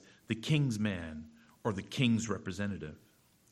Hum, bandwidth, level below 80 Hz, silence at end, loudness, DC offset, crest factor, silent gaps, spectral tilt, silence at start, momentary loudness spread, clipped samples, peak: none; 13.5 kHz; -62 dBFS; 0.55 s; -34 LUFS; under 0.1%; 20 dB; none; -5.5 dB/octave; 0.3 s; 14 LU; under 0.1%; -16 dBFS